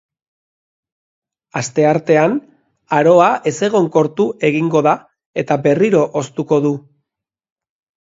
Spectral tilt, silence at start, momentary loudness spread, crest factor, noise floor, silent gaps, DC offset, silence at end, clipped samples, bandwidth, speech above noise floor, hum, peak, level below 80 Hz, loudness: -6 dB/octave; 1.55 s; 12 LU; 16 dB; -83 dBFS; 5.26-5.33 s; under 0.1%; 1.25 s; under 0.1%; 8 kHz; 69 dB; none; 0 dBFS; -62 dBFS; -15 LUFS